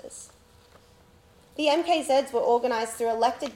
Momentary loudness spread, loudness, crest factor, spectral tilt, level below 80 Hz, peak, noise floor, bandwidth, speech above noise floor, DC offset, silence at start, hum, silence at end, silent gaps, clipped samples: 18 LU; -25 LUFS; 18 dB; -2.5 dB/octave; -64 dBFS; -10 dBFS; -56 dBFS; 17 kHz; 31 dB; under 0.1%; 0.05 s; none; 0 s; none; under 0.1%